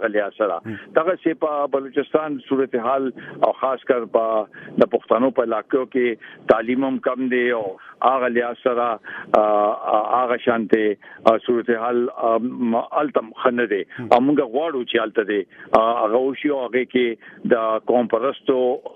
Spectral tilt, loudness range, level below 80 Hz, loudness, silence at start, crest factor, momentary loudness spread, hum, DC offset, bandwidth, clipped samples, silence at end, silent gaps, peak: -7.5 dB/octave; 2 LU; -64 dBFS; -21 LUFS; 0 s; 20 dB; 5 LU; none; under 0.1%; 7 kHz; under 0.1%; 0.1 s; none; 0 dBFS